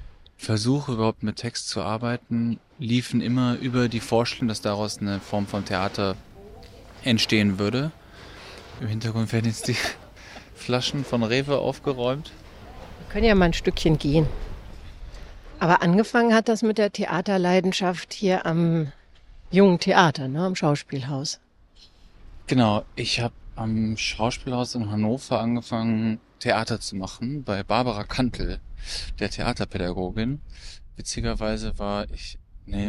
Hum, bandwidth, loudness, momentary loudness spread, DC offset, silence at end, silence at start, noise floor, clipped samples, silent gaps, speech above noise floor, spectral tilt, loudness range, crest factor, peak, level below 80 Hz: none; 14.5 kHz; -24 LUFS; 18 LU; under 0.1%; 0 s; 0 s; -53 dBFS; under 0.1%; none; 30 dB; -5.5 dB/octave; 6 LU; 22 dB; -2 dBFS; -40 dBFS